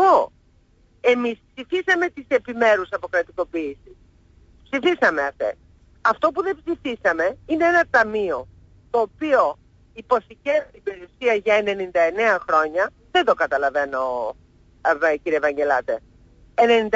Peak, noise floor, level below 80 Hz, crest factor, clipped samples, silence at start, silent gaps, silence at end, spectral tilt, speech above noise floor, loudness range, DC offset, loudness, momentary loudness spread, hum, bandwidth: -6 dBFS; -57 dBFS; -54 dBFS; 16 dB; under 0.1%; 0 s; none; 0 s; -4.5 dB/octave; 36 dB; 3 LU; under 0.1%; -21 LUFS; 10 LU; none; 7.8 kHz